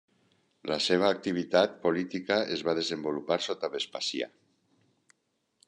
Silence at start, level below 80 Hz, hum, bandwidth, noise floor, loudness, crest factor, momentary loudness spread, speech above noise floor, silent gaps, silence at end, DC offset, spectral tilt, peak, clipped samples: 0.65 s; -74 dBFS; none; 11 kHz; -77 dBFS; -29 LUFS; 22 dB; 8 LU; 48 dB; none; 1.4 s; under 0.1%; -4 dB/octave; -8 dBFS; under 0.1%